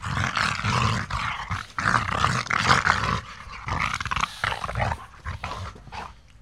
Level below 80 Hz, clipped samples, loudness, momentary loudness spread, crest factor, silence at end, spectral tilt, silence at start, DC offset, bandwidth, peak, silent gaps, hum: -40 dBFS; under 0.1%; -25 LUFS; 17 LU; 24 dB; 0.3 s; -4 dB/octave; 0 s; 0.1%; 14.5 kHz; -2 dBFS; none; none